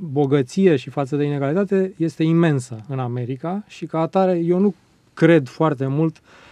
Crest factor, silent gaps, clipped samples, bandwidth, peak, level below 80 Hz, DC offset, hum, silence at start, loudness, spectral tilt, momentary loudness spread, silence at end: 18 dB; none; under 0.1%; 10.5 kHz; 0 dBFS; -66 dBFS; under 0.1%; none; 0 s; -20 LUFS; -8 dB/octave; 10 LU; 0.4 s